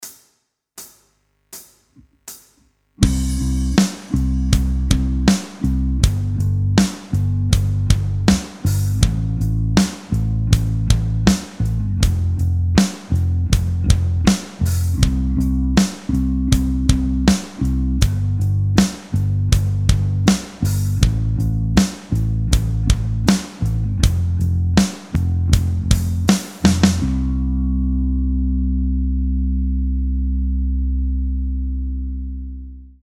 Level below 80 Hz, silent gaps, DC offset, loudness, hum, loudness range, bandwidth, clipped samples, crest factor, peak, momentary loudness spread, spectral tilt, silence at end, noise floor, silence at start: -22 dBFS; none; under 0.1%; -19 LUFS; none; 3 LU; 16.5 kHz; under 0.1%; 18 dB; 0 dBFS; 5 LU; -6 dB/octave; 0.15 s; -66 dBFS; 0 s